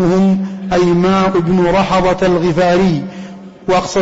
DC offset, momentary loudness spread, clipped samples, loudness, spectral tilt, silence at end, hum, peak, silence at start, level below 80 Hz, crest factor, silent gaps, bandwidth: 0.3%; 11 LU; under 0.1%; -13 LUFS; -6.5 dB/octave; 0 s; none; -4 dBFS; 0 s; -36 dBFS; 8 dB; none; 8 kHz